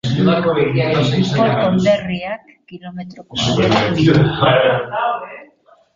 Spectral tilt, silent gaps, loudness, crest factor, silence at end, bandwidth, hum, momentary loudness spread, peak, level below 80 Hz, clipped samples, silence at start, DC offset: -6.5 dB/octave; none; -15 LUFS; 14 dB; 0.5 s; 7.6 kHz; none; 18 LU; -2 dBFS; -44 dBFS; under 0.1%; 0.05 s; under 0.1%